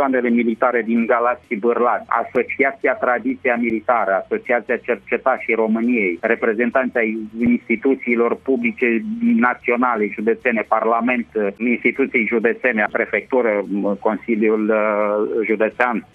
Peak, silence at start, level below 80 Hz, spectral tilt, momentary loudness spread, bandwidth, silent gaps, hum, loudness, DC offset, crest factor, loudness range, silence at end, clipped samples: 0 dBFS; 0 s; -60 dBFS; -8.5 dB/octave; 3 LU; 3.9 kHz; none; none; -19 LUFS; under 0.1%; 18 dB; 1 LU; 0.1 s; under 0.1%